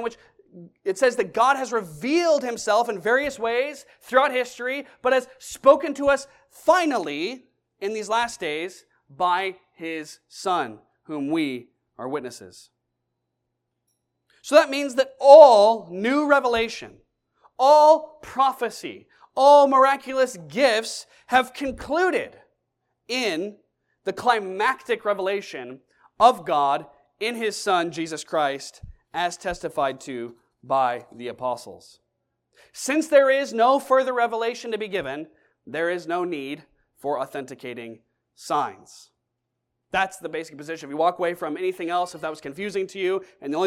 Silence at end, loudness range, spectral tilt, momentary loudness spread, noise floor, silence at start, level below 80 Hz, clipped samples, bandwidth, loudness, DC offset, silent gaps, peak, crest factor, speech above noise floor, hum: 0 s; 13 LU; -3.5 dB/octave; 17 LU; -79 dBFS; 0 s; -60 dBFS; under 0.1%; 15 kHz; -22 LUFS; under 0.1%; none; 0 dBFS; 22 dB; 58 dB; none